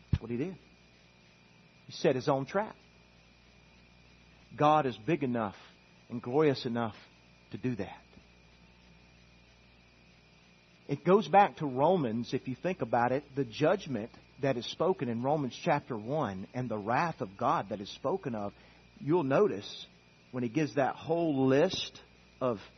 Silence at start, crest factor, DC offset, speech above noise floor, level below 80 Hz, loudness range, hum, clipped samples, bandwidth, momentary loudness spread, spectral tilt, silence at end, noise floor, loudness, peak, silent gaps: 0.1 s; 22 dB; under 0.1%; 30 dB; -60 dBFS; 7 LU; 60 Hz at -60 dBFS; under 0.1%; 6.4 kHz; 14 LU; -6.5 dB/octave; 0.1 s; -61 dBFS; -31 LUFS; -10 dBFS; none